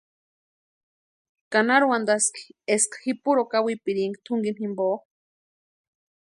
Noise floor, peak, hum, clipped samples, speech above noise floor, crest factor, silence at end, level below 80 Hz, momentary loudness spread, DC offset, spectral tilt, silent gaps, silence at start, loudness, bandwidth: under -90 dBFS; -6 dBFS; none; under 0.1%; over 66 dB; 20 dB; 1.35 s; -78 dBFS; 8 LU; under 0.1%; -3 dB/octave; none; 1.5 s; -24 LUFS; 11.5 kHz